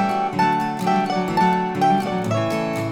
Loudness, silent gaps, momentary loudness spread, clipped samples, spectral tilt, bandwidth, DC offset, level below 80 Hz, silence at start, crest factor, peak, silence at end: -20 LUFS; none; 3 LU; under 0.1%; -6 dB/octave; 17.5 kHz; under 0.1%; -58 dBFS; 0 s; 14 dB; -6 dBFS; 0 s